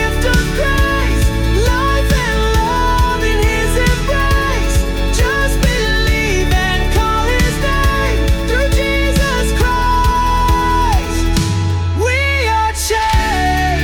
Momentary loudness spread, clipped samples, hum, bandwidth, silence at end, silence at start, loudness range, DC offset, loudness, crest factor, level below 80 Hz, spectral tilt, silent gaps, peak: 2 LU; under 0.1%; none; 18 kHz; 0 s; 0 s; 0 LU; under 0.1%; -14 LUFS; 10 dB; -16 dBFS; -4.5 dB/octave; none; -2 dBFS